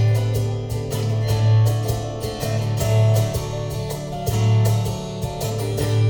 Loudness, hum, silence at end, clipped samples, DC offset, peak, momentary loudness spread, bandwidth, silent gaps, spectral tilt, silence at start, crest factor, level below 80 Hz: -21 LUFS; none; 0 s; under 0.1%; under 0.1%; -8 dBFS; 9 LU; over 20 kHz; none; -6 dB/octave; 0 s; 12 dB; -38 dBFS